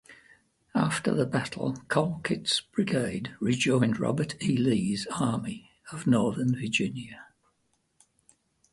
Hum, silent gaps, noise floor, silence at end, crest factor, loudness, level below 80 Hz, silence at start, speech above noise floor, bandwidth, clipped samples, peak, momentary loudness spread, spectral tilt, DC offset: none; none; -73 dBFS; 1.5 s; 20 dB; -28 LUFS; -62 dBFS; 0.1 s; 46 dB; 11.5 kHz; under 0.1%; -8 dBFS; 8 LU; -5.5 dB/octave; under 0.1%